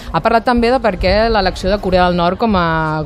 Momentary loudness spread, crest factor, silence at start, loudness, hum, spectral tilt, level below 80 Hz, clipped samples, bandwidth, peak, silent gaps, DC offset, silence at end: 3 LU; 14 dB; 0 s; -14 LUFS; none; -6.5 dB/octave; -26 dBFS; under 0.1%; 13 kHz; 0 dBFS; none; under 0.1%; 0 s